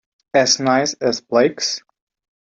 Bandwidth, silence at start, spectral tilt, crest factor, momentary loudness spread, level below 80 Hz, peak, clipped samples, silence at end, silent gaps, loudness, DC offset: 8 kHz; 0.35 s; -2.5 dB/octave; 16 dB; 8 LU; -64 dBFS; -2 dBFS; under 0.1%; 0.65 s; none; -17 LUFS; under 0.1%